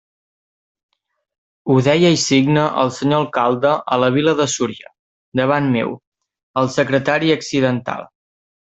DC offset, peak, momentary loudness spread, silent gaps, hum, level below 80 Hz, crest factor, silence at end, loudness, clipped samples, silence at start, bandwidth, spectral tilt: under 0.1%; -2 dBFS; 12 LU; 4.99-5.32 s, 6.07-6.12 s, 6.43-6.54 s; none; -58 dBFS; 16 dB; 0.6 s; -17 LUFS; under 0.1%; 1.65 s; 8.2 kHz; -5 dB/octave